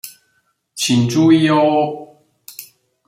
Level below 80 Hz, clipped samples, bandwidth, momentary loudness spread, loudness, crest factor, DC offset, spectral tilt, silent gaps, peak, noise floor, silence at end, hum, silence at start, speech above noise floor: -60 dBFS; under 0.1%; 16 kHz; 23 LU; -14 LUFS; 16 dB; under 0.1%; -5.5 dB/octave; none; -2 dBFS; -64 dBFS; 0.45 s; none; 0.05 s; 51 dB